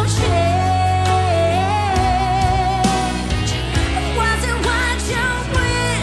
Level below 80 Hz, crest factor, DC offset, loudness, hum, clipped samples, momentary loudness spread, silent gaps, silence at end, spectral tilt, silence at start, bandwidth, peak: -26 dBFS; 14 dB; under 0.1%; -18 LUFS; none; under 0.1%; 3 LU; none; 0 s; -4.5 dB/octave; 0 s; 12 kHz; -2 dBFS